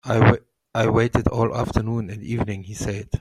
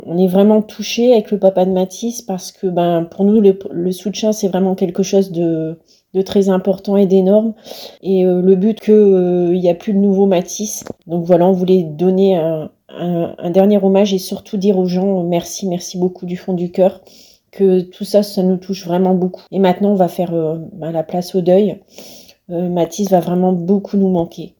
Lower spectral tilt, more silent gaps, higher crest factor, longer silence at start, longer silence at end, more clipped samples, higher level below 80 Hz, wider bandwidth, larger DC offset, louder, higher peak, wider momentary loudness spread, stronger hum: about the same, -7 dB/octave vs -7 dB/octave; neither; first, 20 dB vs 14 dB; about the same, 0.05 s vs 0.05 s; about the same, 0 s vs 0.1 s; neither; first, -38 dBFS vs -58 dBFS; second, 12 kHz vs 19 kHz; neither; second, -22 LUFS vs -15 LUFS; about the same, -2 dBFS vs 0 dBFS; about the same, 11 LU vs 10 LU; neither